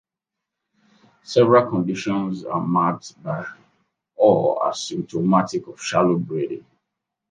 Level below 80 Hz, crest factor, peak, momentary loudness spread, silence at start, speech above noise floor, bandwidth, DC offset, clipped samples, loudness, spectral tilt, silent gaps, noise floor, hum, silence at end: -66 dBFS; 20 dB; -2 dBFS; 13 LU; 1.3 s; 64 dB; 9.6 kHz; under 0.1%; under 0.1%; -21 LUFS; -6 dB/octave; none; -85 dBFS; none; 0.7 s